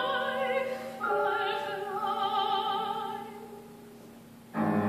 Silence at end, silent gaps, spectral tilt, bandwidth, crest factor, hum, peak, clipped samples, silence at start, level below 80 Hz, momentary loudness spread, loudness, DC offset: 0 s; none; -5.5 dB/octave; 15 kHz; 16 dB; none; -16 dBFS; under 0.1%; 0 s; -76 dBFS; 21 LU; -31 LUFS; under 0.1%